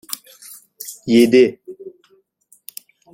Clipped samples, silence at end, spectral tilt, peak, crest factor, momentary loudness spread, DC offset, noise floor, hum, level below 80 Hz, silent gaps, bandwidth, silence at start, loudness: under 0.1%; 1.25 s; -4.5 dB/octave; -2 dBFS; 18 dB; 26 LU; under 0.1%; -58 dBFS; none; -62 dBFS; none; 17 kHz; 0.85 s; -14 LUFS